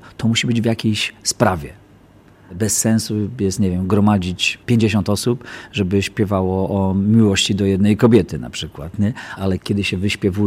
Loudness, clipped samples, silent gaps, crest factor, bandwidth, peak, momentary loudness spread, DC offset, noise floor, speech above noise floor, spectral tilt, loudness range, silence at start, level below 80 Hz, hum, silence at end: -18 LUFS; under 0.1%; none; 16 dB; 16 kHz; -2 dBFS; 11 LU; under 0.1%; -47 dBFS; 30 dB; -5 dB/octave; 3 LU; 0.05 s; -48 dBFS; none; 0 s